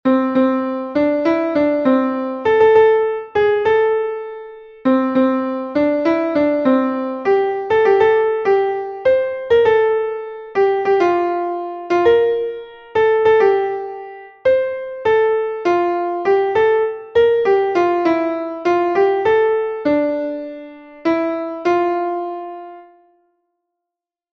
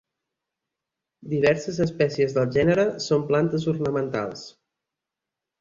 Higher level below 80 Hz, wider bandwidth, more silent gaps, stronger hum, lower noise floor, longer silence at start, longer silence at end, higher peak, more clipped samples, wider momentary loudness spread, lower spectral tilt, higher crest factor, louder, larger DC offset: about the same, -54 dBFS vs -56 dBFS; second, 6.2 kHz vs 7.6 kHz; neither; neither; about the same, -85 dBFS vs -87 dBFS; second, 0.05 s vs 1.25 s; first, 1.5 s vs 1.1 s; first, -2 dBFS vs -6 dBFS; neither; about the same, 11 LU vs 9 LU; about the same, -6.5 dB/octave vs -6.5 dB/octave; about the same, 14 dB vs 18 dB; first, -17 LUFS vs -23 LUFS; neither